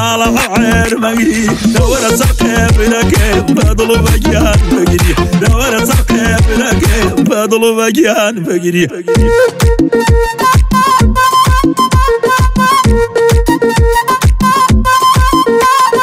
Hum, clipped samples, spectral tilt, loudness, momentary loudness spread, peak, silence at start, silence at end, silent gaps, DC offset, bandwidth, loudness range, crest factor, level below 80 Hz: none; under 0.1%; -5 dB/octave; -10 LUFS; 3 LU; 0 dBFS; 0 s; 0 s; none; under 0.1%; 16.5 kHz; 1 LU; 8 dB; -16 dBFS